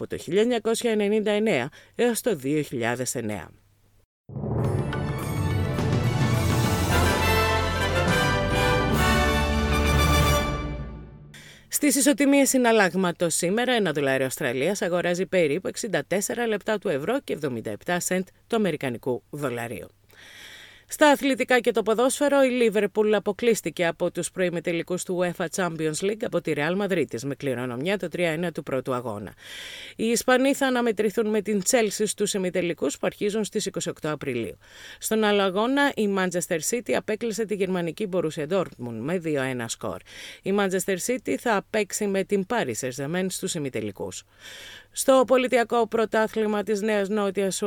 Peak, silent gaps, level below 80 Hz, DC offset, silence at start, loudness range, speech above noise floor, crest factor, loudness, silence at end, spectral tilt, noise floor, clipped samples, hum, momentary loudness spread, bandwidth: -6 dBFS; 4.05-4.24 s; -40 dBFS; under 0.1%; 0 s; 6 LU; 23 dB; 18 dB; -24 LUFS; 0 s; -4.5 dB/octave; -47 dBFS; under 0.1%; none; 11 LU; 19 kHz